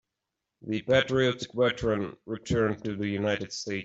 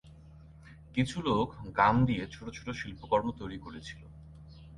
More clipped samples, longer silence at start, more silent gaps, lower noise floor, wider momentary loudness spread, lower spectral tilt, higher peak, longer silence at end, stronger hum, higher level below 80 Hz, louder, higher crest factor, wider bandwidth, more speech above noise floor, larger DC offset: neither; first, 0.65 s vs 0.05 s; neither; first, -86 dBFS vs -53 dBFS; second, 10 LU vs 24 LU; about the same, -5.5 dB/octave vs -6.5 dB/octave; about the same, -10 dBFS vs -12 dBFS; about the same, 0 s vs 0 s; neither; about the same, -54 dBFS vs -52 dBFS; first, -28 LUFS vs -31 LUFS; about the same, 20 dB vs 22 dB; second, 8 kHz vs 11.5 kHz; first, 58 dB vs 22 dB; neither